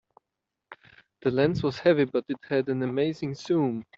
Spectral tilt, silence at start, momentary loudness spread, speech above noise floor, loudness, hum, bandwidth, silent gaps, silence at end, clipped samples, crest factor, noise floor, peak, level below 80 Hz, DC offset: -7.5 dB/octave; 0.7 s; 7 LU; 60 dB; -26 LUFS; none; 7.8 kHz; none; 0.15 s; under 0.1%; 18 dB; -85 dBFS; -8 dBFS; -62 dBFS; under 0.1%